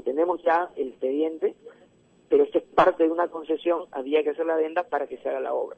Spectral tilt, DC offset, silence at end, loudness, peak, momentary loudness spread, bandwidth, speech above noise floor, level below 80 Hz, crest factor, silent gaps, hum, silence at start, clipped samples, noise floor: -6.5 dB/octave; under 0.1%; 0.05 s; -25 LUFS; -6 dBFS; 9 LU; 8.2 kHz; 34 dB; -64 dBFS; 20 dB; none; none; 0.05 s; under 0.1%; -58 dBFS